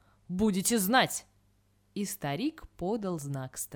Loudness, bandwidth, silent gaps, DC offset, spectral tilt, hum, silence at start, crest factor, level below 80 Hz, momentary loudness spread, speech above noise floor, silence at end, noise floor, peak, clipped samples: -31 LUFS; 20 kHz; none; under 0.1%; -4 dB/octave; 50 Hz at -55 dBFS; 0.3 s; 20 dB; -58 dBFS; 13 LU; 38 dB; 0 s; -68 dBFS; -12 dBFS; under 0.1%